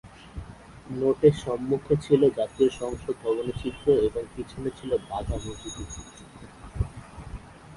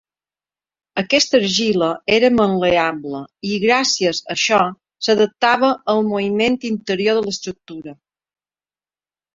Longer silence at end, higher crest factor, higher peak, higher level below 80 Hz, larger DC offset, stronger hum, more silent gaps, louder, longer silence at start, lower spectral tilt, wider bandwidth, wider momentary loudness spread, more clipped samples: second, 0 s vs 1.45 s; about the same, 22 dB vs 18 dB; second, -6 dBFS vs 0 dBFS; first, -42 dBFS vs -56 dBFS; neither; neither; neither; second, -26 LUFS vs -17 LUFS; second, 0.05 s vs 0.95 s; first, -7 dB/octave vs -3.5 dB/octave; first, 11.5 kHz vs 7.8 kHz; first, 22 LU vs 13 LU; neither